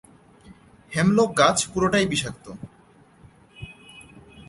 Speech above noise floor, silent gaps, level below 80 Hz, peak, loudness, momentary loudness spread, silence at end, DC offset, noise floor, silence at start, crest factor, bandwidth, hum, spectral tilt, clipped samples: 33 dB; none; -52 dBFS; -2 dBFS; -21 LUFS; 25 LU; 0.3 s; under 0.1%; -54 dBFS; 0.5 s; 22 dB; 11.5 kHz; none; -4 dB/octave; under 0.1%